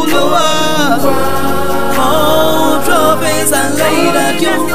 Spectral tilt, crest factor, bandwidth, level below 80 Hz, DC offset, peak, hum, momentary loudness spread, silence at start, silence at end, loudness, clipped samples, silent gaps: -3.5 dB/octave; 12 dB; 15.5 kHz; -36 dBFS; 20%; 0 dBFS; none; 4 LU; 0 s; 0 s; -11 LUFS; under 0.1%; none